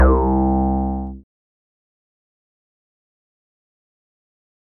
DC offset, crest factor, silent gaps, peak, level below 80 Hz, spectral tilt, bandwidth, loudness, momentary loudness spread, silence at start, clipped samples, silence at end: under 0.1%; 20 dB; none; -2 dBFS; -26 dBFS; -12 dB/octave; 2.2 kHz; -19 LUFS; 12 LU; 0 s; under 0.1%; 3.6 s